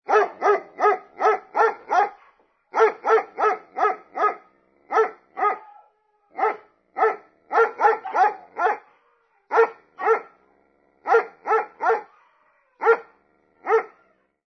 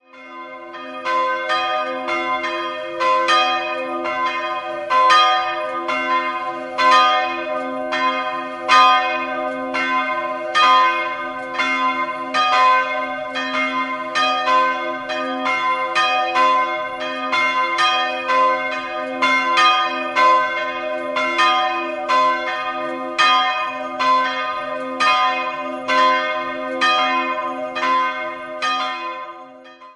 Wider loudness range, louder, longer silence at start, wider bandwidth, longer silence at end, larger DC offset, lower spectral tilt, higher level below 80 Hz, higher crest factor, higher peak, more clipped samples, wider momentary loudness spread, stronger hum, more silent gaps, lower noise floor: about the same, 4 LU vs 3 LU; second, -22 LUFS vs -18 LUFS; about the same, 0.1 s vs 0.15 s; second, 6.4 kHz vs 11.5 kHz; first, 0.6 s vs 0.05 s; neither; first, -3 dB/octave vs -1.5 dB/octave; second, -82 dBFS vs -62 dBFS; about the same, 20 dB vs 18 dB; second, -4 dBFS vs 0 dBFS; neither; second, 7 LU vs 11 LU; neither; neither; first, -64 dBFS vs -41 dBFS